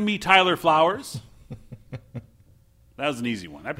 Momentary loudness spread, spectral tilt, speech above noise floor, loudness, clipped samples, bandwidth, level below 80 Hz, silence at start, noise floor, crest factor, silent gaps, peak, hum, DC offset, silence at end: 25 LU; -4.5 dB/octave; 34 dB; -21 LUFS; under 0.1%; 16 kHz; -56 dBFS; 0 s; -56 dBFS; 24 dB; none; -2 dBFS; none; under 0.1%; 0.05 s